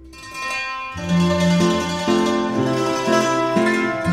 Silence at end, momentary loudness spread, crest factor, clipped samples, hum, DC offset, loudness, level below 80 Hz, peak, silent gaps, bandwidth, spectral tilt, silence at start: 0 s; 9 LU; 14 dB; under 0.1%; none; under 0.1%; -19 LUFS; -48 dBFS; -4 dBFS; none; 14.5 kHz; -5.5 dB/octave; 0 s